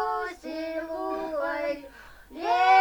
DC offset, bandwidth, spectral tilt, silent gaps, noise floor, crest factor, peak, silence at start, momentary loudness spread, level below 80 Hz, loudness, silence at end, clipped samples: under 0.1%; over 20 kHz; -3.5 dB/octave; none; -48 dBFS; 18 dB; -10 dBFS; 0 s; 18 LU; -58 dBFS; -29 LUFS; 0 s; under 0.1%